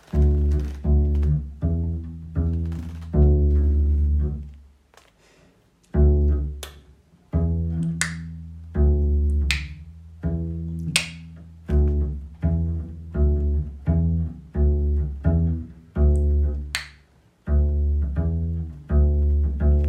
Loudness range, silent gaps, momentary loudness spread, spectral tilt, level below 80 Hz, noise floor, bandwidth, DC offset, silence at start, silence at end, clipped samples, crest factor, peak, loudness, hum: 3 LU; none; 12 LU; -6.5 dB/octave; -24 dBFS; -58 dBFS; 11 kHz; under 0.1%; 0.15 s; 0 s; under 0.1%; 22 dB; 0 dBFS; -24 LUFS; none